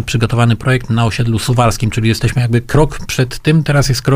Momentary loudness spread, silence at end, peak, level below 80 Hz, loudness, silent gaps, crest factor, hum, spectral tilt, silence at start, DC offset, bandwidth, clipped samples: 3 LU; 0 s; 0 dBFS; -28 dBFS; -14 LUFS; none; 12 dB; none; -6 dB/octave; 0 s; under 0.1%; 16 kHz; under 0.1%